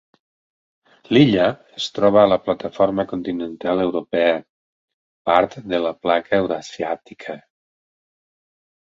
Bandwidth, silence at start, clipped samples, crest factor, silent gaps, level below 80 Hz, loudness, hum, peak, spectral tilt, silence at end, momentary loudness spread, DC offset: 7.8 kHz; 1.1 s; under 0.1%; 20 dB; 4.50-4.88 s, 4.94-5.25 s; -56 dBFS; -19 LUFS; none; 0 dBFS; -6.5 dB/octave; 1.4 s; 13 LU; under 0.1%